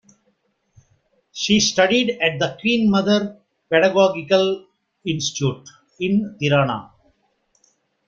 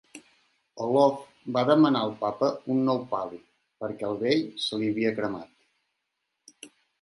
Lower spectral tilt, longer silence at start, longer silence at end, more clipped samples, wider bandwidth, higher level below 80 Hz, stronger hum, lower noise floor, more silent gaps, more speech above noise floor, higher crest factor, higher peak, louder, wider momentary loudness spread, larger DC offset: second, -4.5 dB/octave vs -6 dB/octave; first, 1.35 s vs 0.15 s; first, 1.25 s vs 0.35 s; neither; second, 7.6 kHz vs 11.5 kHz; first, -56 dBFS vs -72 dBFS; neither; second, -67 dBFS vs -81 dBFS; neither; second, 48 dB vs 55 dB; about the same, 18 dB vs 22 dB; first, -2 dBFS vs -6 dBFS; first, -19 LUFS vs -26 LUFS; second, 13 LU vs 16 LU; neither